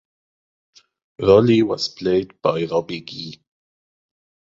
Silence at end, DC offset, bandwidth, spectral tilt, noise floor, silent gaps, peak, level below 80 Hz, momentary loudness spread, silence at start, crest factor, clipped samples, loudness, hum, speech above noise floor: 1.15 s; under 0.1%; 7.6 kHz; -6.5 dB/octave; under -90 dBFS; none; -2 dBFS; -52 dBFS; 18 LU; 1.2 s; 20 dB; under 0.1%; -19 LUFS; none; over 72 dB